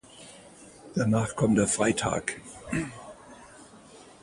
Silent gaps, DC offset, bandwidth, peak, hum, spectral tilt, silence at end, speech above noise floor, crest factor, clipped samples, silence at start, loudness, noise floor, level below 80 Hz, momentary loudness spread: none; under 0.1%; 11.5 kHz; -10 dBFS; none; -5 dB/octave; 0.2 s; 25 dB; 20 dB; under 0.1%; 0.15 s; -27 LUFS; -51 dBFS; -54 dBFS; 25 LU